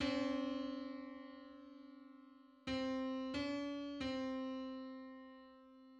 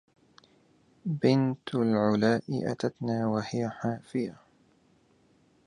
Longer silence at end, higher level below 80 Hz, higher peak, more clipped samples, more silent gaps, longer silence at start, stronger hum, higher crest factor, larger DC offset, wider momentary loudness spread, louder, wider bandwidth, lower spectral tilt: second, 0 s vs 1.35 s; about the same, -68 dBFS vs -68 dBFS; second, -26 dBFS vs -10 dBFS; neither; neither; second, 0 s vs 1.05 s; neither; about the same, 18 dB vs 20 dB; neither; first, 19 LU vs 9 LU; second, -44 LUFS vs -29 LUFS; second, 8.6 kHz vs 10.5 kHz; second, -5 dB/octave vs -7.5 dB/octave